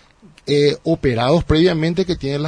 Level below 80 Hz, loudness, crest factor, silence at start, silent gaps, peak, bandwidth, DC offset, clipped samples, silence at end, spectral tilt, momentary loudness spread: -36 dBFS; -17 LUFS; 14 dB; 0.45 s; none; -4 dBFS; 10.5 kHz; under 0.1%; under 0.1%; 0 s; -6.5 dB/octave; 6 LU